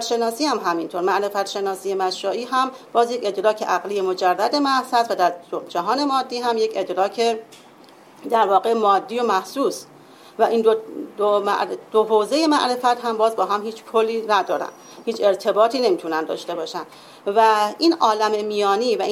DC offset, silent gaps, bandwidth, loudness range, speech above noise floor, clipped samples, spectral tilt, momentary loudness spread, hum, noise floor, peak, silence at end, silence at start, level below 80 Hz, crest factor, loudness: under 0.1%; none; 15.5 kHz; 2 LU; 27 dB; under 0.1%; -3.5 dB/octave; 9 LU; none; -47 dBFS; -4 dBFS; 0 s; 0 s; -74 dBFS; 16 dB; -20 LUFS